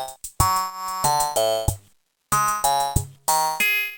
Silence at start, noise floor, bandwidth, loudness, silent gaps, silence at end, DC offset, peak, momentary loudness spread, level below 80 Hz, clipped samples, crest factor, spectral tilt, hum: 0 s; -60 dBFS; 18 kHz; -22 LUFS; none; 0 s; under 0.1%; -2 dBFS; 8 LU; -40 dBFS; under 0.1%; 20 dB; -2.5 dB/octave; none